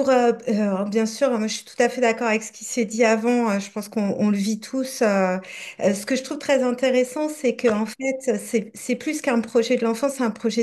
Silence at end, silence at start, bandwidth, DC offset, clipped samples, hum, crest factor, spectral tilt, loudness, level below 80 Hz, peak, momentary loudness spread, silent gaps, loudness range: 0 s; 0 s; 12.5 kHz; under 0.1%; under 0.1%; none; 16 dB; -4.5 dB/octave; -22 LUFS; -70 dBFS; -6 dBFS; 7 LU; none; 1 LU